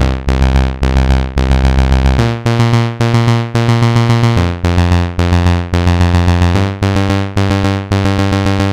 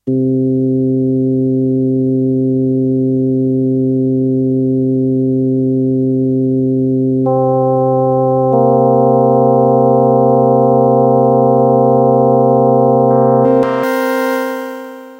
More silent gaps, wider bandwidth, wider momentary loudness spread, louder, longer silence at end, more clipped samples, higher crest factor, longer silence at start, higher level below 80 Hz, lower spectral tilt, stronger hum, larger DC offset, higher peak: neither; second, 12 kHz vs 16 kHz; about the same, 3 LU vs 4 LU; about the same, -12 LUFS vs -12 LUFS; about the same, 0 s vs 0 s; neither; about the same, 10 dB vs 12 dB; about the same, 0 s vs 0.05 s; first, -18 dBFS vs -52 dBFS; second, -6.5 dB/octave vs -9.5 dB/octave; neither; first, 0.3% vs under 0.1%; about the same, 0 dBFS vs 0 dBFS